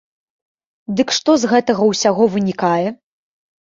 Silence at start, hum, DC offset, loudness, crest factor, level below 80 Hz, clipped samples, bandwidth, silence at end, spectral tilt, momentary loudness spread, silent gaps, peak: 0.9 s; none; under 0.1%; -16 LUFS; 16 dB; -60 dBFS; under 0.1%; 7.8 kHz; 0.7 s; -4.5 dB/octave; 9 LU; none; -2 dBFS